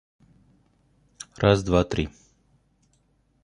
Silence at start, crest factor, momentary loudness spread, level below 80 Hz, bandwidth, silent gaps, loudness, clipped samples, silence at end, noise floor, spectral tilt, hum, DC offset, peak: 1.4 s; 24 dB; 22 LU; -42 dBFS; 11 kHz; none; -23 LUFS; under 0.1%; 1.35 s; -66 dBFS; -6 dB/octave; none; under 0.1%; -4 dBFS